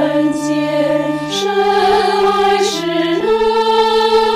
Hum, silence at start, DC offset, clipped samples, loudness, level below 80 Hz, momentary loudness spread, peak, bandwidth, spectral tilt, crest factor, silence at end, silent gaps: none; 0 s; under 0.1%; under 0.1%; -14 LUFS; -46 dBFS; 4 LU; -4 dBFS; 15.5 kHz; -4 dB/octave; 10 dB; 0 s; none